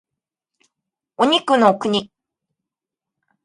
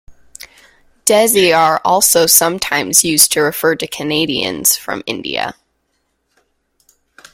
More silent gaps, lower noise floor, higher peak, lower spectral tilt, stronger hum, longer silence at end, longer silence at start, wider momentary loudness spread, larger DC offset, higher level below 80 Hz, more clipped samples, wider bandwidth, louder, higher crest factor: neither; first, -87 dBFS vs -66 dBFS; about the same, -2 dBFS vs 0 dBFS; first, -4.5 dB/octave vs -1.5 dB/octave; neither; second, 1.4 s vs 1.8 s; first, 1.2 s vs 0.1 s; second, 7 LU vs 12 LU; neither; second, -64 dBFS vs -52 dBFS; second, under 0.1% vs 0.1%; second, 11.5 kHz vs over 20 kHz; second, -17 LUFS vs -12 LUFS; about the same, 20 dB vs 16 dB